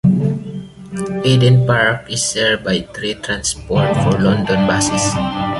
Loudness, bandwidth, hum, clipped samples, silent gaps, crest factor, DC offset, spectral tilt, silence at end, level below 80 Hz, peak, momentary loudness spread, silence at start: -16 LUFS; 11.5 kHz; none; under 0.1%; none; 14 dB; under 0.1%; -4.5 dB/octave; 0 s; -40 dBFS; -2 dBFS; 12 LU; 0.05 s